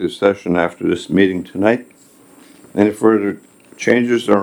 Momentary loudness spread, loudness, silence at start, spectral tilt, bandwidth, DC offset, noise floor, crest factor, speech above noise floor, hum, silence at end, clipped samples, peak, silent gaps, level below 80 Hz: 8 LU; -17 LUFS; 0 s; -6 dB/octave; 19 kHz; under 0.1%; -46 dBFS; 16 dB; 31 dB; none; 0 s; under 0.1%; 0 dBFS; none; -58 dBFS